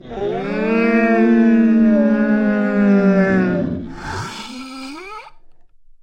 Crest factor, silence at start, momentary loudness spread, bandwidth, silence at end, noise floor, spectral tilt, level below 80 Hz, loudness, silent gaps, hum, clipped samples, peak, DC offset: 12 dB; 0.05 s; 18 LU; 9 kHz; 0.5 s; -43 dBFS; -7.5 dB/octave; -46 dBFS; -15 LUFS; none; none; under 0.1%; -4 dBFS; under 0.1%